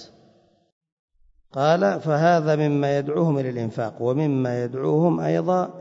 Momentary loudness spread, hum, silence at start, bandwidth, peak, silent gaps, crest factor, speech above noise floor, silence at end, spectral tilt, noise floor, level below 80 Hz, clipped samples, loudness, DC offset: 7 LU; none; 0 s; 7.6 kHz; -6 dBFS; 0.72-0.81 s, 0.92-1.08 s; 16 dB; 37 dB; 0 s; -8 dB/octave; -58 dBFS; -66 dBFS; under 0.1%; -22 LUFS; under 0.1%